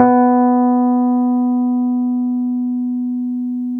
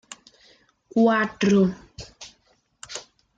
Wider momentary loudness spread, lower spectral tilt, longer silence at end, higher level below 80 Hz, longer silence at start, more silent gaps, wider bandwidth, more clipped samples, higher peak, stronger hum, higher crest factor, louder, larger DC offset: second, 8 LU vs 24 LU; first, -11 dB/octave vs -6 dB/octave; second, 0 s vs 0.4 s; about the same, -60 dBFS vs -58 dBFS; second, 0 s vs 0.95 s; neither; second, 2.4 kHz vs 9.2 kHz; neither; first, 0 dBFS vs -8 dBFS; first, 60 Hz at -75 dBFS vs none; about the same, 16 dB vs 18 dB; first, -16 LUFS vs -21 LUFS; neither